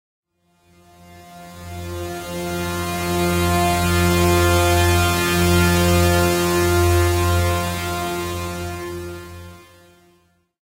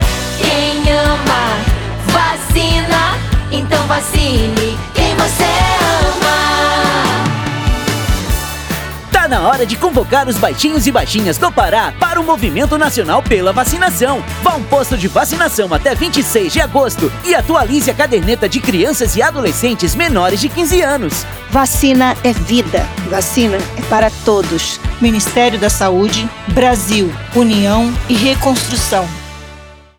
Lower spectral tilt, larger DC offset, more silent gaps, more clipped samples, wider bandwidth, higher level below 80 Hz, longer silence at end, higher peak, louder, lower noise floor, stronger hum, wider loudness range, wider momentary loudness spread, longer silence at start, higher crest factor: about the same, -5 dB/octave vs -4 dB/octave; neither; neither; neither; second, 16 kHz vs over 20 kHz; second, -34 dBFS vs -24 dBFS; first, 1.15 s vs 0.25 s; second, -4 dBFS vs 0 dBFS; second, -19 LUFS vs -13 LUFS; first, -60 dBFS vs -35 dBFS; neither; first, 10 LU vs 1 LU; first, 16 LU vs 5 LU; first, 1.1 s vs 0 s; about the same, 16 dB vs 12 dB